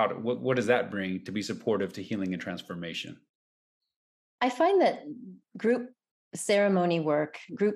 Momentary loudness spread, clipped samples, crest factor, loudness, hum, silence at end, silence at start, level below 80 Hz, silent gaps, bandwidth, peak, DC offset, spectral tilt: 15 LU; under 0.1%; 16 dB; -29 LUFS; none; 0 s; 0 s; -78 dBFS; 3.29-3.80 s, 3.96-4.38 s, 6.11-6.31 s; 14.5 kHz; -12 dBFS; under 0.1%; -5.5 dB/octave